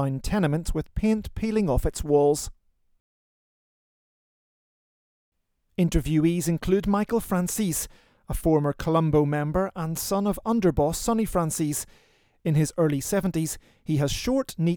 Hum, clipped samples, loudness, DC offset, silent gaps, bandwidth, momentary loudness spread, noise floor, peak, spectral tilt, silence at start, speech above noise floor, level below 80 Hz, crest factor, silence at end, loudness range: none; under 0.1%; -25 LUFS; under 0.1%; 3.00-5.32 s; over 20 kHz; 7 LU; under -90 dBFS; -8 dBFS; -6 dB/octave; 0 s; over 66 dB; -40 dBFS; 18 dB; 0 s; 5 LU